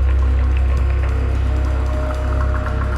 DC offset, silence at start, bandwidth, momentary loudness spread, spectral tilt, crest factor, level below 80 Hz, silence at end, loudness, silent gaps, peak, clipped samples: under 0.1%; 0 s; 5.2 kHz; 3 LU; -8 dB/octave; 8 dB; -16 dBFS; 0 s; -19 LUFS; none; -8 dBFS; under 0.1%